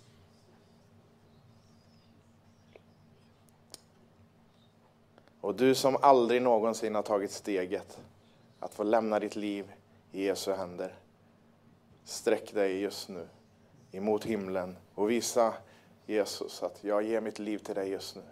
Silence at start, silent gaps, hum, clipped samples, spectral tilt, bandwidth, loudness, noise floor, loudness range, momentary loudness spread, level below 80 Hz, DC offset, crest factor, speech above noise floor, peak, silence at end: 5.45 s; none; none; under 0.1%; -4.5 dB/octave; 16 kHz; -31 LUFS; -63 dBFS; 8 LU; 20 LU; -78 dBFS; under 0.1%; 26 dB; 33 dB; -8 dBFS; 0 s